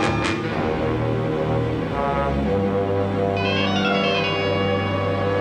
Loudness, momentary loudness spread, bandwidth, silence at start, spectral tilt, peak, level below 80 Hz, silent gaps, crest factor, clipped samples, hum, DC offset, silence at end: -22 LUFS; 3 LU; 10 kHz; 0 s; -6.5 dB/octave; -6 dBFS; -38 dBFS; none; 16 dB; under 0.1%; none; under 0.1%; 0 s